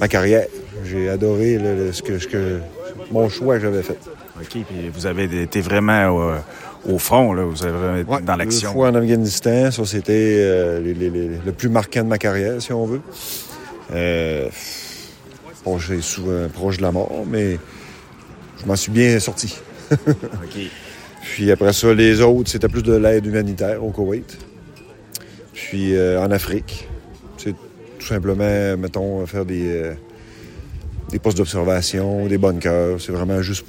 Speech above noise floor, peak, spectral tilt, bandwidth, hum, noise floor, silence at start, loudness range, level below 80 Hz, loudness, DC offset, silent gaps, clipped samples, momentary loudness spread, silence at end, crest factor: 23 dB; 0 dBFS; -5.5 dB/octave; 16.5 kHz; none; -42 dBFS; 0 s; 7 LU; -40 dBFS; -19 LUFS; under 0.1%; none; under 0.1%; 18 LU; 0.05 s; 18 dB